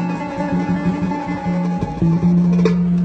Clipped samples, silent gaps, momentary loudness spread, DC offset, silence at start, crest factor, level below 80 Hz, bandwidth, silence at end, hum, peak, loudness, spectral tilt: under 0.1%; none; 7 LU; under 0.1%; 0 s; 16 dB; -38 dBFS; 6.4 kHz; 0 s; none; -2 dBFS; -18 LUFS; -9 dB/octave